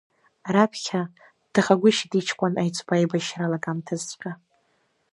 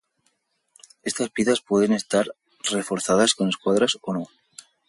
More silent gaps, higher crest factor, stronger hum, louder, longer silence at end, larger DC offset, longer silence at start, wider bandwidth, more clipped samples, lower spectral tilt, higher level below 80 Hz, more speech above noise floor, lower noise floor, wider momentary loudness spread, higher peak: neither; about the same, 22 dB vs 18 dB; neither; about the same, -24 LUFS vs -23 LUFS; first, 0.75 s vs 0.6 s; neither; second, 0.45 s vs 1.05 s; about the same, 11.5 kHz vs 11.5 kHz; neither; first, -5 dB/octave vs -3.5 dB/octave; second, -72 dBFS vs -64 dBFS; about the same, 45 dB vs 48 dB; about the same, -69 dBFS vs -70 dBFS; first, 16 LU vs 11 LU; first, -2 dBFS vs -6 dBFS